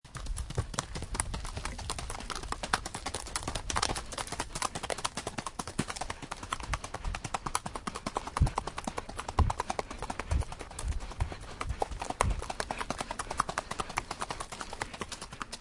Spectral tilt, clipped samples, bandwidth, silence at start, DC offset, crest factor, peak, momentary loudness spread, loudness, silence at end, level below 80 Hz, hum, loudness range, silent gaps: -3.5 dB/octave; under 0.1%; 11.5 kHz; 0.05 s; under 0.1%; 30 dB; -6 dBFS; 8 LU; -36 LUFS; 0 s; -40 dBFS; none; 2 LU; none